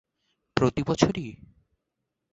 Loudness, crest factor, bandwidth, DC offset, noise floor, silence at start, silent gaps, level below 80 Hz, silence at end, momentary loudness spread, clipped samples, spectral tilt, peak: -26 LUFS; 26 dB; 8.2 kHz; under 0.1%; -83 dBFS; 0.55 s; none; -50 dBFS; 0.95 s; 11 LU; under 0.1%; -6 dB/octave; -4 dBFS